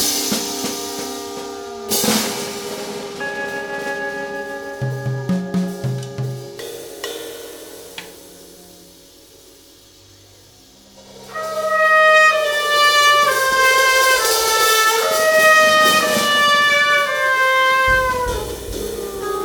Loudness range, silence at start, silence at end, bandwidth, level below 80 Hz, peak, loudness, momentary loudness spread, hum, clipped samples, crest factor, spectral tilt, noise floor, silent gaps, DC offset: 18 LU; 0 s; 0 s; 19 kHz; -44 dBFS; -2 dBFS; -15 LUFS; 18 LU; none; under 0.1%; 16 dB; -2 dB/octave; -47 dBFS; none; under 0.1%